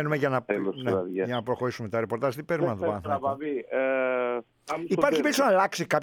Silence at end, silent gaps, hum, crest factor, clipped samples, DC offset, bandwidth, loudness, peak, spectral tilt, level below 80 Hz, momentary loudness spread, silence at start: 0 s; none; none; 18 dB; under 0.1%; under 0.1%; 19.5 kHz; -27 LUFS; -8 dBFS; -5.5 dB/octave; -66 dBFS; 7 LU; 0 s